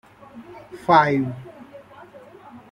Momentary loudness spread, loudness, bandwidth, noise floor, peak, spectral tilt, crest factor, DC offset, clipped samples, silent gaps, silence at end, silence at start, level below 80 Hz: 27 LU; -19 LUFS; 12.5 kHz; -45 dBFS; -2 dBFS; -7 dB/octave; 22 dB; under 0.1%; under 0.1%; none; 0.15 s; 0.35 s; -60 dBFS